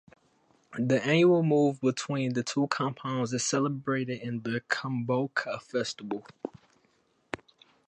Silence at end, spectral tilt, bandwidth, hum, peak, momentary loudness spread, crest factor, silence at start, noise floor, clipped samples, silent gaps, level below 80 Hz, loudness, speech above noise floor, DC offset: 0.5 s; -5 dB/octave; 10.5 kHz; none; -10 dBFS; 18 LU; 20 dB; 0.7 s; -69 dBFS; under 0.1%; none; -72 dBFS; -29 LUFS; 41 dB; under 0.1%